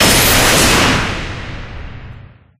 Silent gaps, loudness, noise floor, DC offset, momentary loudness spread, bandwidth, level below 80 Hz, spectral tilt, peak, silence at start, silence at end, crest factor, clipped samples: none; -10 LUFS; -36 dBFS; under 0.1%; 22 LU; 16 kHz; -26 dBFS; -2.5 dB/octave; 0 dBFS; 0 s; 0.35 s; 14 dB; under 0.1%